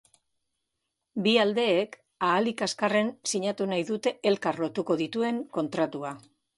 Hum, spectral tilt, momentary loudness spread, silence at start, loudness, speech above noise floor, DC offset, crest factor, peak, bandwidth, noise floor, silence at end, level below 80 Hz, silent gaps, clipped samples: none; -4 dB/octave; 8 LU; 1.15 s; -27 LUFS; 55 dB; under 0.1%; 18 dB; -10 dBFS; 11.5 kHz; -82 dBFS; 0.4 s; -74 dBFS; none; under 0.1%